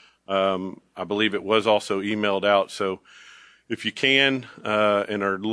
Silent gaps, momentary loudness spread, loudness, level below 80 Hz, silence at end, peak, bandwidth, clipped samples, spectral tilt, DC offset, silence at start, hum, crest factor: none; 11 LU; -23 LUFS; -70 dBFS; 0 s; -4 dBFS; 11 kHz; under 0.1%; -4.5 dB/octave; under 0.1%; 0.3 s; none; 20 dB